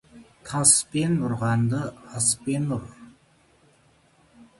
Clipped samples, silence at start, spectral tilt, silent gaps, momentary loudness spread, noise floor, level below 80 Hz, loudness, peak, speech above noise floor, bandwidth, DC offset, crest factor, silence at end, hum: under 0.1%; 0.15 s; -4 dB/octave; none; 15 LU; -60 dBFS; -56 dBFS; -23 LUFS; -4 dBFS; 36 dB; 12 kHz; under 0.1%; 22 dB; 0.15 s; none